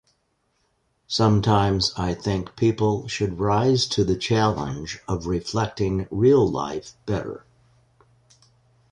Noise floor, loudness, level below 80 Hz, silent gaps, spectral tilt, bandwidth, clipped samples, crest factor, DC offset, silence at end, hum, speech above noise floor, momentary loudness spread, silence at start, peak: -70 dBFS; -23 LUFS; -44 dBFS; none; -6 dB/octave; 10.5 kHz; under 0.1%; 18 dB; under 0.1%; 1.5 s; none; 48 dB; 11 LU; 1.1 s; -4 dBFS